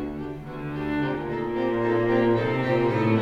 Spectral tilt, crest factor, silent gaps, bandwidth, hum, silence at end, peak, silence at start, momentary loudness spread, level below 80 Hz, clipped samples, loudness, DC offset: -8.5 dB/octave; 16 dB; none; 7 kHz; none; 0 s; -10 dBFS; 0 s; 12 LU; -48 dBFS; under 0.1%; -25 LUFS; under 0.1%